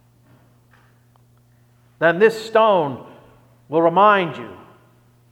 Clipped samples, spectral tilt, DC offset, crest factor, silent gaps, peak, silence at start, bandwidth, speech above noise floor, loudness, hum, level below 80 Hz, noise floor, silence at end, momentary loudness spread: under 0.1%; -6 dB/octave; under 0.1%; 18 dB; none; -2 dBFS; 2 s; 14 kHz; 38 dB; -17 LUFS; none; -68 dBFS; -55 dBFS; 0.75 s; 18 LU